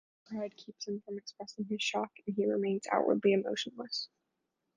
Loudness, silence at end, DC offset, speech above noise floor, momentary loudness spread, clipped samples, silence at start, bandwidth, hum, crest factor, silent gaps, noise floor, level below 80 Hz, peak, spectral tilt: -34 LUFS; 0.7 s; under 0.1%; 50 dB; 15 LU; under 0.1%; 0.3 s; 9.8 kHz; none; 22 dB; none; -84 dBFS; -82 dBFS; -14 dBFS; -4.5 dB/octave